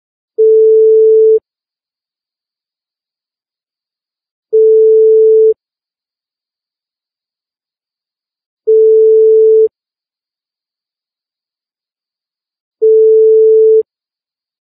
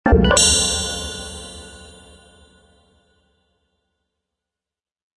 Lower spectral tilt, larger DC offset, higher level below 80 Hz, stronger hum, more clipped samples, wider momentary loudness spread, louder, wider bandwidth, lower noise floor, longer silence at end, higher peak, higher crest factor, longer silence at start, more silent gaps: first, -10.5 dB/octave vs -3 dB/octave; neither; second, -78 dBFS vs -30 dBFS; neither; neither; second, 8 LU vs 24 LU; first, -8 LUFS vs -15 LUFS; second, 0.6 kHz vs 11.5 kHz; about the same, under -90 dBFS vs -90 dBFS; second, 0.8 s vs 3.3 s; about the same, -2 dBFS vs 0 dBFS; second, 8 dB vs 22 dB; first, 0.4 s vs 0.05 s; first, 4.31-4.43 s, 8.46-8.57 s, 12.60-12.71 s vs none